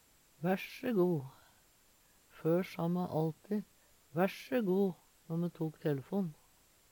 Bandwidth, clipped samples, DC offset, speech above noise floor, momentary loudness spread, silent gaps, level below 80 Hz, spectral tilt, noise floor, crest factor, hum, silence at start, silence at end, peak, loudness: 19 kHz; under 0.1%; under 0.1%; 33 dB; 9 LU; none; -76 dBFS; -8 dB/octave; -67 dBFS; 18 dB; none; 0.4 s; 0.6 s; -18 dBFS; -36 LUFS